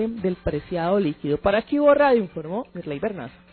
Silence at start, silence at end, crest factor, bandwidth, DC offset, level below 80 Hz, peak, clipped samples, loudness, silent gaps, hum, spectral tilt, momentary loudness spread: 0 s; 0.2 s; 16 dB; 4.5 kHz; under 0.1%; -46 dBFS; -6 dBFS; under 0.1%; -23 LUFS; none; none; -11.5 dB/octave; 13 LU